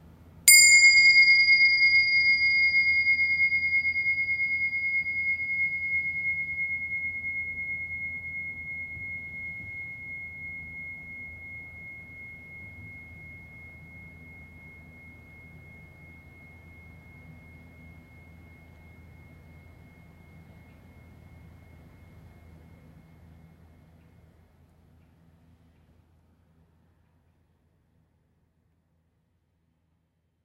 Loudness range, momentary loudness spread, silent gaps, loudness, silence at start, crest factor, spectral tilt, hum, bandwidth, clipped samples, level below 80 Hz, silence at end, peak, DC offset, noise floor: 28 LU; 27 LU; none; -21 LUFS; 0.45 s; 26 dB; 1.5 dB/octave; none; 16 kHz; under 0.1%; -58 dBFS; 11.45 s; -2 dBFS; under 0.1%; -73 dBFS